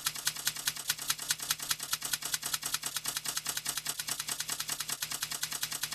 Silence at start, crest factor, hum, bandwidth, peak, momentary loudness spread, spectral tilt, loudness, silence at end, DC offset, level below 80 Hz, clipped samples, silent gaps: 0 s; 24 dB; none; 15.5 kHz; -12 dBFS; 2 LU; 1 dB/octave; -33 LUFS; 0 s; under 0.1%; -66 dBFS; under 0.1%; none